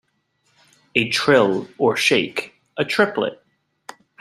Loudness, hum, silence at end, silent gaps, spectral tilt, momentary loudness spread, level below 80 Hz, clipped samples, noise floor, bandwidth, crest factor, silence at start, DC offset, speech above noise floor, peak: -19 LUFS; none; 0.85 s; none; -4 dB/octave; 11 LU; -64 dBFS; under 0.1%; -67 dBFS; 14.5 kHz; 20 dB; 0.95 s; under 0.1%; 48 dB; -2 dBFS